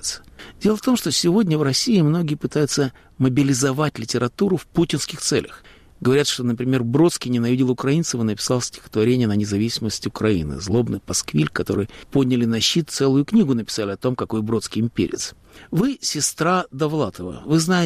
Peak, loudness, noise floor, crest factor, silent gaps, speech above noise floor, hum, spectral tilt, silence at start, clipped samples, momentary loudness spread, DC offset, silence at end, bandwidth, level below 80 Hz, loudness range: -8 dBFS; -21 LUFS; -40 dBFS; 14 dB; none; 20 dB; none; -5 dB/octave; 0 s; under 0.1%; 6 LU; under 0.1%; 0 s; 15.5 kHz; -48 dBFS; 2 LU